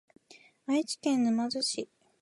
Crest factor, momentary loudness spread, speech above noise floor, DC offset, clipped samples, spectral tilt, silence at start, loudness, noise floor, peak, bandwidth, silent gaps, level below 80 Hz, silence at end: 14 dB; 14 LU; 30 dB; under 0.1%; under 0.1%; -3 dB/octave; 0.7 s; -30 LUFS; -59 dBFS; -16 dBFS; 11.5 kHz; none; -82 dBFS; 0.35 s